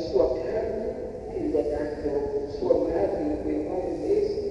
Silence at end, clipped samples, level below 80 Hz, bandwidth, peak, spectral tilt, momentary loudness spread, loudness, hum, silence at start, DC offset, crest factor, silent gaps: 0 s; under 0.1%; -44 dBFS; 10.5 kHz; -8 dBFS; -8 dB/octave; 7 LU; -27 LUFS; none; 0 s; under 0.1%; 18 dB; none